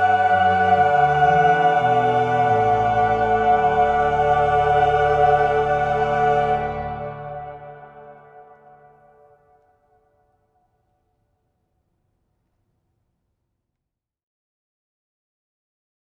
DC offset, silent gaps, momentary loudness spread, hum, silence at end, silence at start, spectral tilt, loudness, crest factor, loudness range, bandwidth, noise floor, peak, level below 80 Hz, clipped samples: under 0.1%; none; 13 LU; none; 7.7 s; 0 s; -6.5 dB/octave; -18 LUFS; 16 dB; 12 LU; 7.6 kHz; -83 dBFS; -4 dBFS; -44 dBFS; under 0.1%